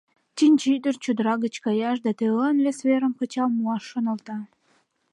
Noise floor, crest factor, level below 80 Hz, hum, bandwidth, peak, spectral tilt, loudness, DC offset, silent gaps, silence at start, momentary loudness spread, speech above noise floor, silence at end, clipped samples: -66 dBFS; 14 dB; -80 dBFS; none; 11.5 kHz; -10 dBFS; -5.5 dB/octave; -23 LUFS; under 0.1%; none; 0.35 s; 8 LU; 43 dB; 0.65 s; under 0.1%